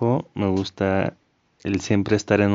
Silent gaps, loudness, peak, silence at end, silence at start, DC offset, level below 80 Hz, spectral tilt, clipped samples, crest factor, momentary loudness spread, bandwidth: none; -23 LUFS; -4 dBFS; 0 s; 0 s; under 0.1%; -54 dBFS; -6.5 dB/octave; under 0.1%; 18 dB; 7 LU; 7.6 kHz